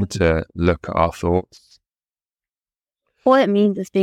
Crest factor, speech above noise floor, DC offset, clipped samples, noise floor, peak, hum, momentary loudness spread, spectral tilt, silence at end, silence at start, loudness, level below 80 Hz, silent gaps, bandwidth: 18 dB; over 72 dB; under 0.1%; under 0.1%; under -90 dBFS; -2 dBFS; none; 6 LU; -7 dB/octave; 0 s; 0 s; -19 LUFS; -38 dBFS; none; 13.5 kHz